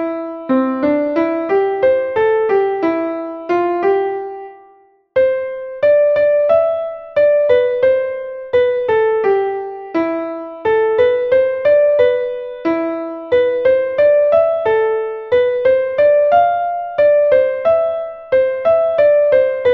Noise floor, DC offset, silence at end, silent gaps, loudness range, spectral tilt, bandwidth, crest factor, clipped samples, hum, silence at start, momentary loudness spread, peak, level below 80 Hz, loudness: -49 dBFS; under 0.1%; 0 s; none; 3 LU; -7.5 dB/octave; 5.2 kHz; 12 dB; under 0.1%; none; 0 s; 10 LU; -2 dBFS; -54 dBFS; -15 LUFS